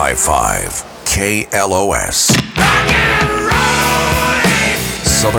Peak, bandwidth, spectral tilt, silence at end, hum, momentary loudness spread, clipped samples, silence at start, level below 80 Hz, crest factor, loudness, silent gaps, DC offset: 0 dBFS; over 20 kHz; -3 dB/octave; 0 s; none; 5 LU; under 0.1%; 0 s; -28 dBFS; 14 dB; -12 LUFS; none; under 0.1%